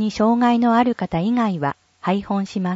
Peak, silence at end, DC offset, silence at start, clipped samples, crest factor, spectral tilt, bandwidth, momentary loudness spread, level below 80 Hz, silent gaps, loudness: -6 dBFS; 0 s; under 0.1%; 0 s; under 0.1%; 14 dB; -7 dB/octave; 7.8 kHz; 9 LU; -52 dBFS; none; -20 LUFS